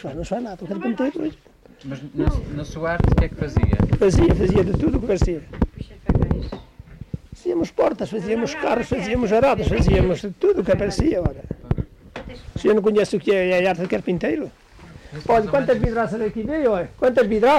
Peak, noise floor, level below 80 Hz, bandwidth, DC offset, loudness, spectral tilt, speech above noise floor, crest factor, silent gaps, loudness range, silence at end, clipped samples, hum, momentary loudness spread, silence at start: -10 dBFS; -43 dBFS; -30 dBFS; 12.5 kHz; under 0.1%; -21 LUFS; -7.5 dB/octave; 23 dB; 10 dB; none; 4 LU; 0 s; under 0.1%; none; 14 LU; 0 s